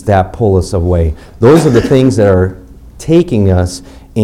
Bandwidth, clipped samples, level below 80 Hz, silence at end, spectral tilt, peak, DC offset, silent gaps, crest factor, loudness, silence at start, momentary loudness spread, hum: 14 kHz; under 0.1%; -26 dBFS; 0 s; -7.5 dB/octave; 0 dBFS; under 0.1%; none; 10 dB; -10 LUFS; 0 s; 10 LU; none